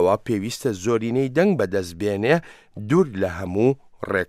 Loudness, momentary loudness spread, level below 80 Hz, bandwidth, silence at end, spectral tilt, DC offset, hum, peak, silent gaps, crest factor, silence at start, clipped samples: -22 LUFS; 6 LU; -54 dBFS; 15.5 kHz; 0.05 s; -6.5 dB/octave; under 0.1%; none; -4 dBFS; none; 16 dB; 0 s; under 0.1%